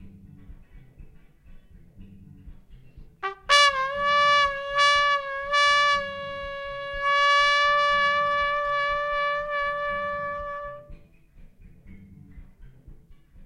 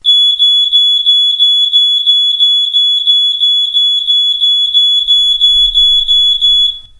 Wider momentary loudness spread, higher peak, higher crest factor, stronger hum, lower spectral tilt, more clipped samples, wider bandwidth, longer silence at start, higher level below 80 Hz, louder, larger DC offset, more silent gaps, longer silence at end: first, 15 LU vs 2 LU; second, -4 dBFS vs 0 dBFS; first, 22 dB vs 8 dB; neither; first, -1 dB/octave vs 2.5 dB/octave; neither; about the same, 12 kHz vs 11 kHz; about the same, 0 s vs 0.05 s; second, -48 dBFS vs -38 dBFS; second, -22 LUFS vs -6 LUFS; neither; neither; second, 0 s vs 0.2 s